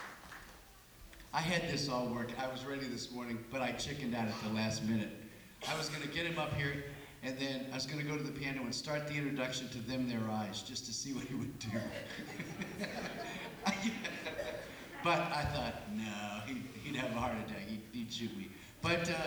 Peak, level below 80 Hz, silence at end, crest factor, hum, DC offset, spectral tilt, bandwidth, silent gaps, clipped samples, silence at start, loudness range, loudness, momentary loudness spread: -20 dBFS; -60 dBFS; 0 s; 20 dB; none; under 0.1%; -4.5 dB/octave; over 20 kHz; none; under 0.1%; 0 s; 3 LU; -39 LUFS; 10 LU